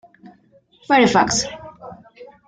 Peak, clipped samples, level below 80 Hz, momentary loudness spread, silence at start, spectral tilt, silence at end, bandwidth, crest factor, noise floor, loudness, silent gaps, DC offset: -2 dBFS; under 0.1%; -52 dBFS; 25 LU; 0.9 s; -3 dB/octave; 0.2 s; 10 kHz; 20 dB; -55 dBFS; -17 LUFS; none; under 0.1%